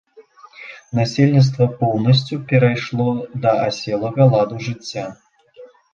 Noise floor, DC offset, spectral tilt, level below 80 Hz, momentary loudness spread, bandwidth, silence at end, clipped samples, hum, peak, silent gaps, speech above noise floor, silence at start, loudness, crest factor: -46 dBFS; under 0.1%; -7 dB/octave; -54 dBFS; 14 LU; 7.4 kHz; 0.25 s; under 0.1%; none; -2 dBFS; none; 29 dB; 0.2 s; -18 LUFS; 16 dB